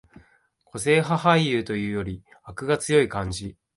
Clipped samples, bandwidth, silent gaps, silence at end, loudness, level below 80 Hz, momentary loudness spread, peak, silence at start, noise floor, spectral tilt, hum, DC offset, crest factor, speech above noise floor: under 0.1%; 11.5 kHz; none; 0.25 s; -23 LUFS; -50 dBFS; 16 LU; -4 dBFS; 0.75 s; -63 dBFS; -5 dB/octave; none; under 0.1%; 20 dB; 39 dB